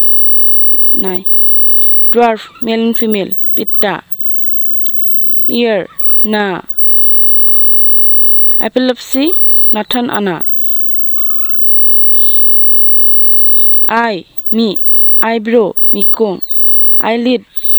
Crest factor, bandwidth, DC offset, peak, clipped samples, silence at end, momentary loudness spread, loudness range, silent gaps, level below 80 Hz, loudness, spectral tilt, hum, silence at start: 8 dB; over 20 kHz; under 0.1%; 0 dBFS; under 0.1%; 0 s; 10 LU; 4 LU; none; -56 dBFS; -6 LUFS; -5.5 dB/octave; none; 0 s